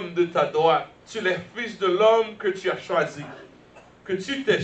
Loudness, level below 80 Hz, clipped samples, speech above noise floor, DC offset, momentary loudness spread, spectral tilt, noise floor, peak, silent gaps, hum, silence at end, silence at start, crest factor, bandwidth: -23 LUFS; -66 dBFS; under 0.1%; 27 dB; under 0.1%; 14 LU; -5 dB/octave; -50 dBFS; -8 dBFS; none; none; 0 s; 0 s; 16 dB; 8.6 kHz